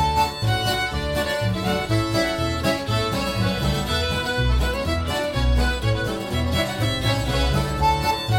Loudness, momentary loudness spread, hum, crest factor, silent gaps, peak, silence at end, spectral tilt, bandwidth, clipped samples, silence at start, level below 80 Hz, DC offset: -22 LUFS; 3 LU; none; 14 dB; none; -8 dBFS; 0 s; -5 dB/octave; 17 kHz; under 0.1%; 0 s; -28 dBFS; under 0.1%